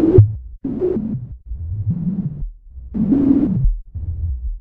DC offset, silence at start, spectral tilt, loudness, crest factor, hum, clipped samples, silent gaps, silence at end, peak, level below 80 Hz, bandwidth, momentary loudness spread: under 0.1%; 0 s; -13.5 dB/octave; -20 LUFS; 18 dB; none; under 0.1%; none; 0 s; 0 dBFS; -26 dBFS; 2.6 kHz; 16 LU